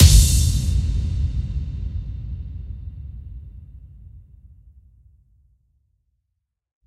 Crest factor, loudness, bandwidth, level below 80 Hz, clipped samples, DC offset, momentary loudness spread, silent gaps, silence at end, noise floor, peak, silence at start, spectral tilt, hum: 22 dB; -22 LUFS; 16 kHz; -24 dBFS; under 0.1%; under 0.1%; 25 LU; none; 2.65 s; -78 dBFS; 0 dBFS; 0 s; -4 dB/octave; none